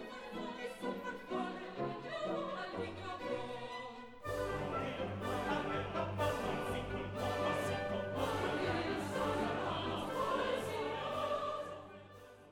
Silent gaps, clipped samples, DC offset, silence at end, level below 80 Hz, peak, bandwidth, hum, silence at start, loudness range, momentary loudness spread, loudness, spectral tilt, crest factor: none; under 0.1%; under 0.1%; 0 s; -60 dBFS; -24 dBFS; 19 kHz; none; 0 s; 5 LU; 8 LU; -39 LUFS; -5.5 dB/octave; 16 dB